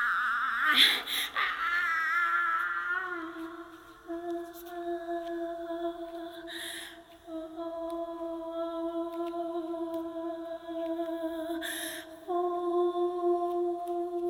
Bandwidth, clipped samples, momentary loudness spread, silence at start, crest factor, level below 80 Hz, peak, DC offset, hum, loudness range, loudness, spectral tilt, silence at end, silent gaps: 18 kHz; under 0.1%; 14 LU; 0 s; 24 dB; -68 dBFS; -8 dBFS; under 0.1%; none; 11 LU; -31 LUFS; -1.5 dB/octave; 0 s; none